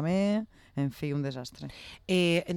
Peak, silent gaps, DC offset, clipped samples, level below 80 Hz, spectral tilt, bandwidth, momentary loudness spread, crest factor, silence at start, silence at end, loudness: -16 dBFS; none; under 0.1%; under 0.1%; -60 dBFS; -6 dB/octave; 16.5 kHz; 17 LU; 14 dB; 0 s; 0 s; -30 LUFS